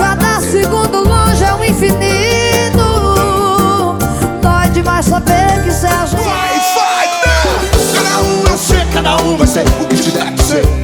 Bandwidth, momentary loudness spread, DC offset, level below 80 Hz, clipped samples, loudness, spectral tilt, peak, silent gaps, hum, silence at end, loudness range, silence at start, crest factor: 20 kHz; 2 LU; under 0.1%; -18 dBFS; under 0.1%; -11 LUFS; -4.5 dB/octave; 0 dBFS; none; none; 0 s; 1 LU; 0 s; 10 dB